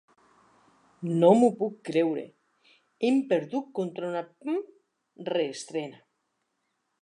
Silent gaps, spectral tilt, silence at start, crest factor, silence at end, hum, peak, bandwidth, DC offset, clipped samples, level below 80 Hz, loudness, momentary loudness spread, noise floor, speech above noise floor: none; -6.5 dB/octave; 1 s; 22 dB; 1.1 s; none; -8 dBFS; 11 kHz; under 0.1%; under 0.1%; -84 dBFS; -27 LUFS; 16 LU; -78 dBFS; 52 dB